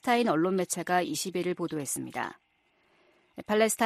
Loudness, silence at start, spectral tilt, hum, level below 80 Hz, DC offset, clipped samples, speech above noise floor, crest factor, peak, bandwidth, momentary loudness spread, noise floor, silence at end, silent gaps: -29 LUFS; 0.05 s; -4 dB/octave; none; -72 dBFS; under 0.1%; under 0.1%; 41 dB; 18 dB; -12 dBFS; 15 kHz; 11 LU; -69 dBFS; 0 s; none